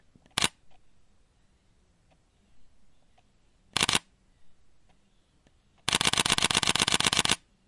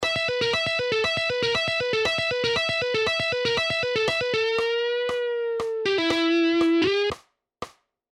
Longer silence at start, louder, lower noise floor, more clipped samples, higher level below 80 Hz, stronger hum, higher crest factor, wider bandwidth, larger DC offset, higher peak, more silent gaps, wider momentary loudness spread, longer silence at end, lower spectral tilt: first, 0.35 s vs 0 s; about the same, -25 LUFS vs -23 LUFS; first, -65 dBFS vs -44 dBFS; neither; about the same, -56 dBFS vs -56 dBFS; neither; first, 26 dB vs 14 dB; about the same, 11.5 kHz vs 12 kHz; neither; first, -6 dBFS vs -10 dBFS; neither; about the same, 7 LU vs 6 LU; second, 0.3 s vs 0.45 s; second, -1 dB/octave vs -4 dB/octave